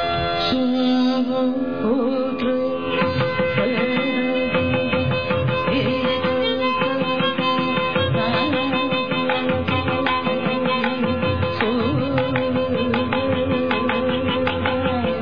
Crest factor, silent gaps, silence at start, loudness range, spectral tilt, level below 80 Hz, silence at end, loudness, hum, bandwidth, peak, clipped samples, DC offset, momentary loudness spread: 14 dB; none; 0 s; 1 LU; -8 dB/octave; -46 dBFS; 0 s; -20 LUFS; none; 5.4 kHz; -6 dBFS; under 0.1%; 0.9%; 2 LU